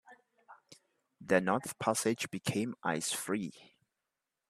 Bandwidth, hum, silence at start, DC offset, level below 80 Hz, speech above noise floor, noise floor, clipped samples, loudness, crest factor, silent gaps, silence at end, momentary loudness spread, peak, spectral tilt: 14.5 kHz; none; 0.1 s; under 0.1%; -74 dBFS; 55 dB; -88 dBFS; under 0.1%; -34 LUFS; 24 dB; none; 0.9 s; 7 LU; -12 dBFS; -4 dB/octave